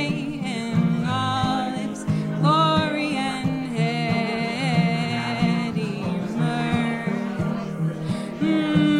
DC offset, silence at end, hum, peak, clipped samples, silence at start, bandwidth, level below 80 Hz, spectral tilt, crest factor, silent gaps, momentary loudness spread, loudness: under 0.1%; 0 s; none; -6 dBFS; under 0.1%; 0 s; 11 kHz; -52 dBFS; -6.5 dB/octave; 16 dB; none; 7 LU; -23 LUFS